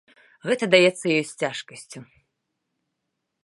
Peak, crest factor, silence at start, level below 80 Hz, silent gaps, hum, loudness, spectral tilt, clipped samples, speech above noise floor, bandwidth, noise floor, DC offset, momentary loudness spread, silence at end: -2 dBFS; 24 dB; 0.45 s; -74 dBFS; none; none; -21 LUFS; -4 dB/octave; under 0.1%; 57 dB; 11.5 kHz; -80 dBFS; under 0.1%; 23 LU; 1.4 s